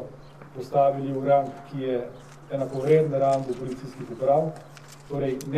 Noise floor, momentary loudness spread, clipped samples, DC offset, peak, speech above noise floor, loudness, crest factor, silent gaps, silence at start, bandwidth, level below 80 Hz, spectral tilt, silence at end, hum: -45 dBFS; 21 LU; under 0.1%; 0.2%; -8 dBFS; 20 dB; -25 LUFS; 18 dB; none; 0 s; 13.5 kHz; -58 dBFS; -7.5 dB/octave; 0 s; none